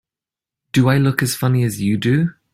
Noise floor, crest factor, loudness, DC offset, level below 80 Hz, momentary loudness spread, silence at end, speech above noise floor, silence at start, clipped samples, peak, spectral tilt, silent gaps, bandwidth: -89 dBFS; 16 dB; -17 LUFS; under 0.1%; -52 dBFS; 4 LU; 0.2 s; 73 dB; 0.75 s; under 0.1%; -2 dBFS; -6 dB/octave; none; 16 kHz